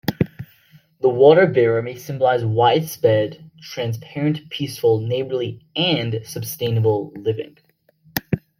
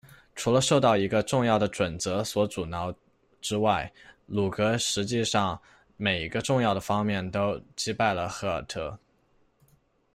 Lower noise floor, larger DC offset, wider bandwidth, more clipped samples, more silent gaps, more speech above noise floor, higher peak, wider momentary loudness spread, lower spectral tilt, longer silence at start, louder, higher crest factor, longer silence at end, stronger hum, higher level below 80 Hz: second, -56 dBFS vs -66 dBFS; neither; about the same, 16.5 kHz vs 15 kHz; neither; neither; about the same, 37 dB vs 39 dB; first, 0 dBFS vs -10 dBFS; about the same, 14 LU vs 12 LU; first, -6 dB/octave vs -4.5 dB/octave; second, 0.05 s vs 0.35 s; first, -20 LUFS vs -27 LUFS; about the same, 20 dB vs 18 dB; second, 0.2 s vs 1.2 s; neither; about the same, -56 dBFS vs -56 dBFS